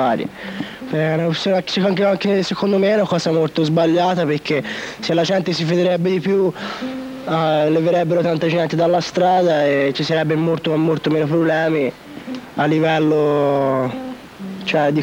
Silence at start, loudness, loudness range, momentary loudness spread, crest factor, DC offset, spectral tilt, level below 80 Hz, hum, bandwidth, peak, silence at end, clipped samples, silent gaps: 0 s; -18 LUFS; 2 LU; 11 LU; 12 dB; under 0.1%; -6.5 dB/octave; -56 dBFS; none; 16.5 kHz; -6 dBFS; 0 s; under 0.1%; none